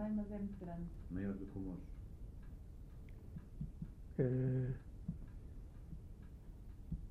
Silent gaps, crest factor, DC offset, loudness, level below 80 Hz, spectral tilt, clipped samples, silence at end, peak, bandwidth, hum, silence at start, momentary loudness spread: none; 22 dB; under 0.1%; -45 LUFS; -52 dBFS; -10.5 dB/octave; under 0.1%; 0 s; -24 dBFS; 3.9 kHz; none; 0 s; 18 LU